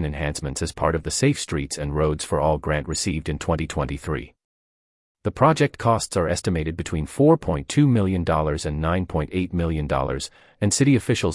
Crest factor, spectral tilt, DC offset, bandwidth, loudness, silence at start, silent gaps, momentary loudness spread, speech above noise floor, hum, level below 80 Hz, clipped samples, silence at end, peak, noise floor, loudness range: 18 dB; -5.5 dB/octave; under 0.1%; 12 kHz; -23 LUFS; 0 s; 4.44-5.15 s; 9 LU; over 68 dB; none; -38 dBFS; under 0.1%; 0 s; -4 dBFS; under -90 dBFS; 4 LU